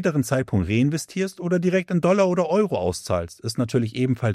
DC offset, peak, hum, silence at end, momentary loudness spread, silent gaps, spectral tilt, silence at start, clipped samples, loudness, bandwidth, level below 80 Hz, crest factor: under 0.1%; -6 dBFS; none; 0 s; 7 LU; none; -6.5 dB/octave; 0 s; under 0.1%; -23 LUFS; 14.5 kHz; -52 dBFS; 16 dB